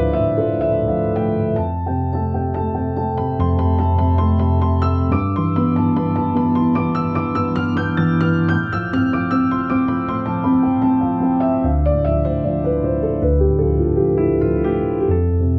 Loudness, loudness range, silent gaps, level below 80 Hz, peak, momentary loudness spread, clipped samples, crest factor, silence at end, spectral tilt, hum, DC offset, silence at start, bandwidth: -18 LUFS; 2 LU; none; -28 dBFS; -4 dBFS; 5 LU; under 0.1%; 12 dB; 0 s; -11 dB/octave; none; under 0.1%; 0 s; 5.8 kHz